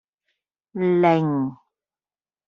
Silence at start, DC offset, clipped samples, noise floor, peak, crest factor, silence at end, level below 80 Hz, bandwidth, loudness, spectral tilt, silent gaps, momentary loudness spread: 0.75 s; under 0.1%; under 0.1%; under -90 dBFS; -4 dBFS; 20 dB; 0.95 s; -68 dBFS; 6.4 kHz; -21 LUFS; -7 dB/octave; none; 12 LU